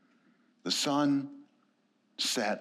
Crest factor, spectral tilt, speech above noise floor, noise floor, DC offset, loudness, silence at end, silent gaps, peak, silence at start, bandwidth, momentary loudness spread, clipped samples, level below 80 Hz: 18 dB; -3 dB/octave; 42 dB; -72 dBFS; under 0.1%; -30 LUFS; 0 s; none; -16 dBFS; 0.65 s; 15 kHz; 17 LU; under 0.1%; under -90 dBFS